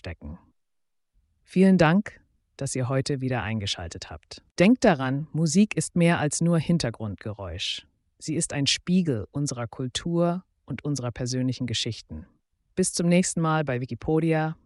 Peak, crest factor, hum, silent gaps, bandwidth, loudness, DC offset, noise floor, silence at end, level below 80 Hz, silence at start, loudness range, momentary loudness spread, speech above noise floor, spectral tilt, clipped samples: -8 dBFS; 18 dB; none; 4.51-4.55 s; 11.5 kHz; -25 LUFS; under 0.1%; -74 dBFS; 0.15 s; -52 dBFS; 0.05 s; 5 LU; 16 LU; 50 dB; -5 dB/octave; under 0.1%